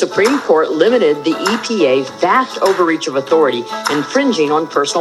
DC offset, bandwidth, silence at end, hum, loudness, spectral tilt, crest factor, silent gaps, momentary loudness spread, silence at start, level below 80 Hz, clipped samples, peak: under 0.1%; 13 kHz; 0 s; none; -14 LUFS; -4 dB/octave; 14 dB; none; 4 LU; 0 s; -64 dBFS; under 0.1%; 0 dBFS